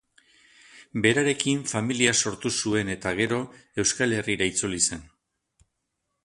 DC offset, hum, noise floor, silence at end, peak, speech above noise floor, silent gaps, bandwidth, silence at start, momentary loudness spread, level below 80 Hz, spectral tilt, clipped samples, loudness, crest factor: under 0.1%; none; -79 dBFS; 1.2 s; -4 dBFS; 54 dB; none; 11.5 kHz; 0.75 s; 7 LU; -56 dBFS; -3 dB/octave; under 0.1%; -25 LUFS; 22 dB